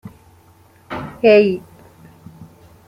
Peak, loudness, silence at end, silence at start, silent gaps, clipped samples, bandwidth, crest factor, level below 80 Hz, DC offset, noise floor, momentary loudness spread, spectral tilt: -2 dBFS; -14 LUFS; 0.45 s; 0.05 s; none; under 0.1%; 6.6 kHz; 18 dB; -54 dBFS; under 0.1%; -50 dBFS; 19 LU; -7 dB/octave